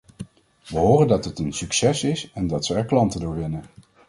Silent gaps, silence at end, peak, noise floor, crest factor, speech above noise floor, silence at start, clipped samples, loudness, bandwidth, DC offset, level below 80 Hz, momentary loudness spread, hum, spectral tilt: none; 0.4 s; -4 dBFS; -41 dBFS; 18 dB; 19 dB; 0.2 s; under 0.1%; -22 LUFS; 11.5 kHz; under 0.1%; -44 dBFS; 15 LU; none; -5.5 dB/octave